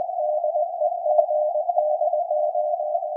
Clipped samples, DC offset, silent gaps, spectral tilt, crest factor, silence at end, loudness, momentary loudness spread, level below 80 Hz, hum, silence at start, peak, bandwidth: under 0.1%; under 0.1%; none; -5 dB/octave; 16 dB; 0 s; -23 LUFS; 4 LU; under -90 dBFS; none; 0 s; -6 dBFS; 1 kHz